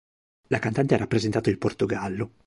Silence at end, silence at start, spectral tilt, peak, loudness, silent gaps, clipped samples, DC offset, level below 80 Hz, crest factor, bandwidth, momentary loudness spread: 0.2 s; 0.5 s; -6.5 dB/octave; -6 dBFS; -25 LUFS; none; under 0.1%; under 0.1%; -52 dBFS; 20 dB; 11.5 kHz; 6 LU